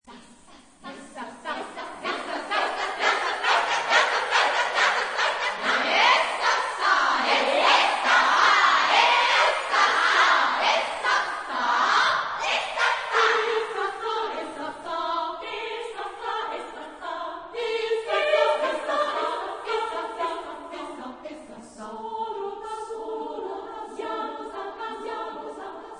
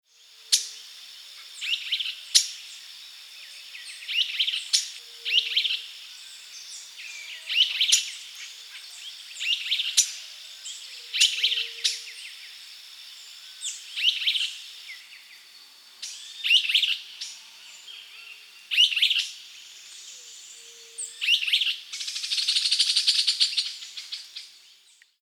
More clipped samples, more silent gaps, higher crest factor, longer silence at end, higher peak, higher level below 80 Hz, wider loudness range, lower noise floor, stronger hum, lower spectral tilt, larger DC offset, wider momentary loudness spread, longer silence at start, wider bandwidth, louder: neither; neither; second, 20 dB vs 26 dB; second, 0 s vs 0.7 s; about the same, -4 dBFS vs -2 dBFS; first, -64 dBFS vs under -90 dBFS; first, 14 LU vs 5 LU; second, -51 dBFS vs -58 dBFS; neither; first, -0.5 dB/octave vs 7.5 dB/octave; neither; second, 18 LU vs 22 LU; second, 0.05 s vs 0.4 s; second, 10.5 kHz vs over 20 kHz; about the same, -23 LUFS vs -23 LUFS